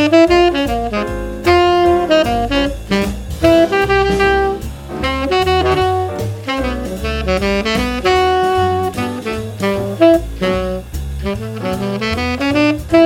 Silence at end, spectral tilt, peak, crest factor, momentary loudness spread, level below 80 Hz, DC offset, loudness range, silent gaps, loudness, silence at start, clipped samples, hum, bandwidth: 0 s; -5.5 dB/octave; 0 dBFS; 14 dB; 10 LU; -28 dBFS; under 0.1%; 4 LU; none; -15 LUFS; 0 s; under 0.1%; none; 17 kHz